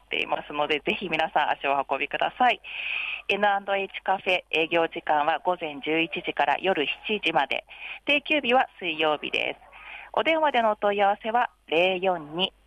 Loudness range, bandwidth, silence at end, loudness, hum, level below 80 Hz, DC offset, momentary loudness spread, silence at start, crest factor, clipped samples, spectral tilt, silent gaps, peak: 1 LU; 11 kHz; 0.2 s; -25 LUFS; none; -64 dBFS; under 0.1%; 6 LU; 0.1 s; 16 dB; under 0.1%; -5 dB/octave; none; -10 dBFS